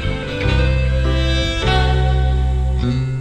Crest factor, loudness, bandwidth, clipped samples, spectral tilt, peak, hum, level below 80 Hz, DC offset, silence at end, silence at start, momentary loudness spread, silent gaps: 14 dB; -18 LUFS; 9 kHz; under 0.1%; -6 dB/octave; -2 dBFS; none; -18 dBFS; under 0.1%; 0 s; 0 s; 3 LU; none